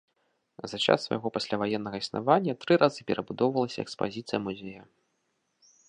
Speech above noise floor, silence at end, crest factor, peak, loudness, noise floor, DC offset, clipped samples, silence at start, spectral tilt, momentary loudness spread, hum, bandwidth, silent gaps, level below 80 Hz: 48 dB; 1.05 s; 24 dB; -6 dBFS; -28 LUFS; -76 dBFS; under 0.1%; under 0.1%; 0.6 s; -5.5 dB/octave; 12 LU; none; 10 kHz; none; -68 dBFS